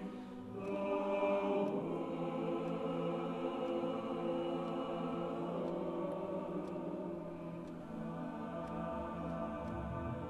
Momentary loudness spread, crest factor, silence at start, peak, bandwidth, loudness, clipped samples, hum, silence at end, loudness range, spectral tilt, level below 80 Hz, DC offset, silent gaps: 9 LU; 16 dB; 0 s; -24 dBFS; 12 kHz; -40 LUFS; under 0.1%; none; 0 s; 5 LU; -8 dB/octave; -62 dBFS; under 0.1%; none